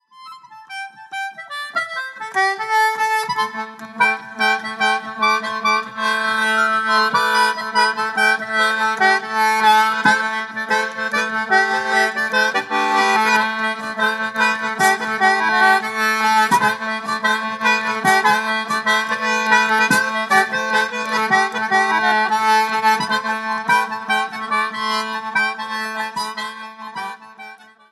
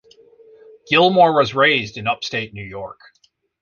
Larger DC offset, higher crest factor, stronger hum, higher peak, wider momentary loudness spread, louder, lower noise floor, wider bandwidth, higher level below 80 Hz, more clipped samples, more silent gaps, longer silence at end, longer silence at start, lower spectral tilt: neither; about the same, 18 dB vs 18 dB; neither; about the same, -2 dBFS vs -2 dBFS; second, 10 LU vs 18 LU; about the same, -17 LUFS vs -16 LUFS; second, -40 dBFS vs -49 dBFS; first, 13 kHz vs 7.2 kHz; second, -74 dBFS vs -56 dBFS; neither; neither; second, 0.35 s vs 0.7 s; second, 0.15 s vs 0.9 s; second, -2 dB/octave vs -5 dB/octave